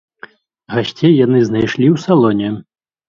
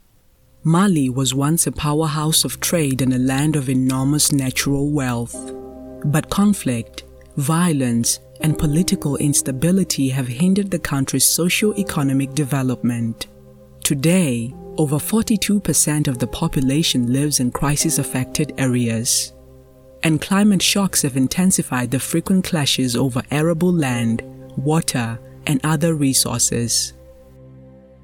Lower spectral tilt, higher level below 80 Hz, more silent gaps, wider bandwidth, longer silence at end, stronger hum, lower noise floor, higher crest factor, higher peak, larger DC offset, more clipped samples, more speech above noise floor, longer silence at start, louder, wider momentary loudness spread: first, -7.5 dB/octave vs -4.5 dB/octave; second, -52 dBFS vs -42 dBFS; neither; second, 7.4 kHz vs 18 kHz; about the same, 0.45 s vs 0.35 s; neither; second, -40 dBFS vs -54 dBFS; about the same, 14 dB vs 16 dB; about the same, 0 dBFS vs -2 dBFS; neither; neither; second, 28 dB vs 36 dB; about the same, 0.7 s vs 0.65 s; first, -14 LUFS vs -18 LUFS; about the same, 10 LU vs 8 LU